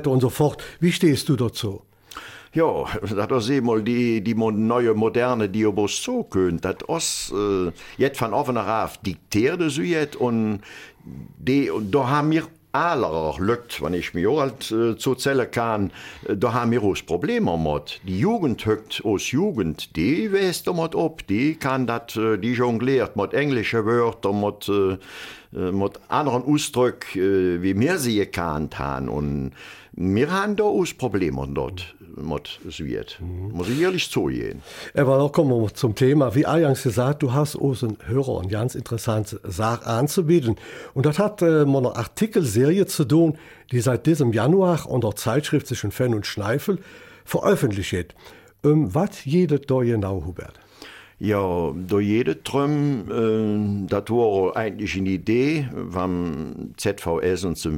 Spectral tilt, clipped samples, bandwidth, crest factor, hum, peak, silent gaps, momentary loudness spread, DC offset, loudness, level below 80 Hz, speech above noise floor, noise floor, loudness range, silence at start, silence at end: -6 dB/octave; under 0.1%; 17 kHz; 16 dB; none; -6 dBFS; none; 10 LU; under 0.1%; -22 LUFS; -48 dBFS; 22 dB; -44 dBFS; 4 LU; 0 s; 0 s